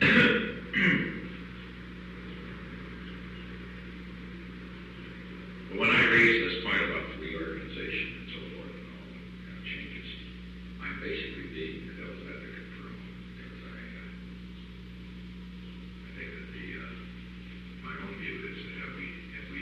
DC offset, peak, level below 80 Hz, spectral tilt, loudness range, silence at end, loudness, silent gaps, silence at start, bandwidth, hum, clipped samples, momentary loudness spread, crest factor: under 0.1%; -10 dBFS; -50 dBFS; -6 dB/octave; 17 LU; 0 s; -30 LUFS; none; 0 s; 9.8 kHz; 60 Hz at -45 dBFS; under 0.1%; 20 LU; 24 dB